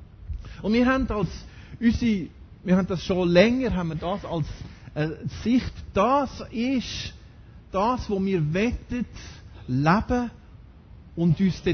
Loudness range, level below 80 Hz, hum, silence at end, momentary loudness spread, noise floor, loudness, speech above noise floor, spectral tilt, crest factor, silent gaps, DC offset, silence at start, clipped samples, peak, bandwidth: 3 LU; -40 dBFS; none; 0 s; 17 LU; -47 dBFS; -25 LUFS; 24 dB; -7 dB/octave; 20 dB; none; under 0.1%; 0 s; under 0.1%; -4 dBFS; 6.6 kHz